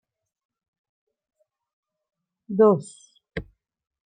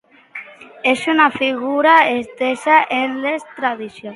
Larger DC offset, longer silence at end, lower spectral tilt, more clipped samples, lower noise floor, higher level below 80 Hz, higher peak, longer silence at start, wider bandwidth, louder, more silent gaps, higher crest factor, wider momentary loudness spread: neither; first, 0.65 s vs 0 s; first, -7.5 dB/octave vs -3.5 dB/octave; neither; about the same, -38 dBFS vs -37 dBFS; first, -56 dBFS vs -66 dBFS; second, -6 dBFS vs 0 dBFS; first, 2.5 s vs 0.35 s; second, 9.4 kHz vs 11.5 kHz; second, -21 LUFS vs -16 LUFS; neither; first, 24 dB vs 18 dB; about the same, 19 LU vs 18 LU